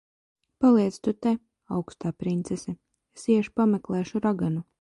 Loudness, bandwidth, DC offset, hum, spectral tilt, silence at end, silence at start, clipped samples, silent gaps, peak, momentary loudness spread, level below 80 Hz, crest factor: -26 LUFS; 11.5 kHz; under 0.1%; none; -7.5 dB/octave; 0.2 s; 0.6 s; under 0.1%; none; -10 dBFS; 12 LU; -60 dBFS; 16 dB